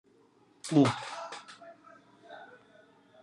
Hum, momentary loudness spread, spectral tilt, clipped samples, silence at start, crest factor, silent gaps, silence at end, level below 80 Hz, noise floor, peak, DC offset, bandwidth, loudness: none; 26 LU; -6 dB/octave; under 0.1%; 0.65 s; 22 dB; none; 0.75 s; -80 dBFS; -64 dBFS; -12 dBFS; under 0.1%; 11.5 kHz; -29 LUFS